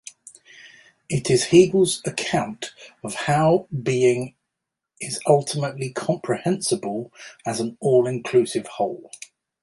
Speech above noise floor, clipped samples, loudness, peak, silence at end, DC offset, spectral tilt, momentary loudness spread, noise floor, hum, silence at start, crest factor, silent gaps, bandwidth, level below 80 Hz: 62 dB; under 0.1%; -22 LUFS; -2 dBFS; 0.45 s; under 0.1%; -5 dB/octave; 17 LU; -83 dBFS; none; 0.65 s; 20 dB; none; 11.5 kHz; -60 dBFS